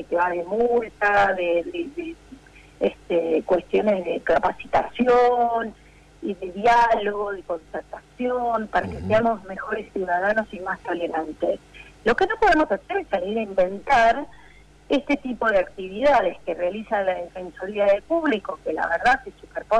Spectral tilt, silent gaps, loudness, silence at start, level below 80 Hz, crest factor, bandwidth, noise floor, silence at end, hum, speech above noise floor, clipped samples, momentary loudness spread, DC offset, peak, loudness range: -5.5 dB/octave; none; -23 LUFS; 0 s; -48 dBFS; 12 dB; 10.5 kHz; -50 dBFS; 0 s; none; 27 dB; under 0.1%; 13 LU; under 0.1%; -10 dBFS; 3 LU